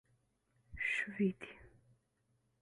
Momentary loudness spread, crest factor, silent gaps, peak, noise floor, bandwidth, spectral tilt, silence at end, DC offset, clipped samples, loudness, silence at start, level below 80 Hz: 17 LU; 18 dB; none; -24 dBFS; -79 dBFS; 11 kHz; -6 dB/octave; 0.95 s; under 0.1%; under 0.1%; -37 LUFS; 0.7 s; -66 dBFS